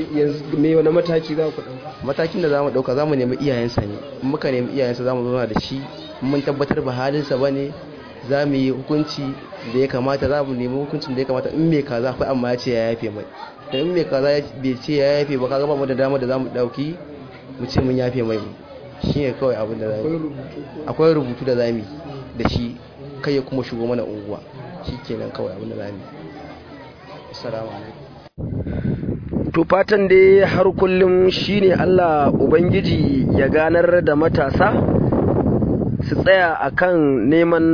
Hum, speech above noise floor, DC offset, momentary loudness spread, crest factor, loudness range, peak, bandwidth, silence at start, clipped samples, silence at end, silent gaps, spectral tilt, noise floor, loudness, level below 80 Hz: none; 20 dB; under 0.1%; 17 LU; 18 dB; 10 LU; -2 dBFS; 5.4 kHz; 0 s; under 0.1%; 0 s; none; -8 dB/octave; -39 dBFS; -19 LUFS; -40 dBFS